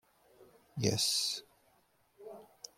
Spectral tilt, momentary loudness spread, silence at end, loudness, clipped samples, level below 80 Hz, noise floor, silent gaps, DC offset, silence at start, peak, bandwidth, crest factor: -3 dB/octave; 22 LU; 0.35 s; -32 LUFS; under 0.1%; -72 dBFS; -71 dBFS; none; under 0.1%; 0.4 s; -16 dBFS; 16.5 kHz; 24 dB